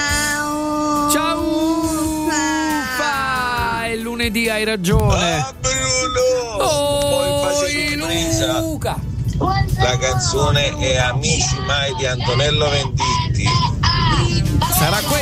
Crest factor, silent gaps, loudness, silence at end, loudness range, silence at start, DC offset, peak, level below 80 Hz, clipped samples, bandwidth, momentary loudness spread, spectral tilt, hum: 14 dB; none; -17 LUFS; 0 s; 2 LU; 0 s; under 0.1%; -2 dBFS; -30 dBFS; under 0.1%; 16 kHz; 4 LU; -4 dB/octave; none